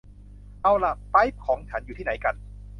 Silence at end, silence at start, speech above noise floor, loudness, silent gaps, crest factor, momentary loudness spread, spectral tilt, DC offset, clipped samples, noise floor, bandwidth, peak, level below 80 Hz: 0 s; 0.3 s; 21 dB; -25 LUFS; none; 20 dB; 10 LU; -7 dB/octave; under 0.1%; under 0.1%; -45 dBFS; 10 kHz; -6 dBFS; -42 dBFS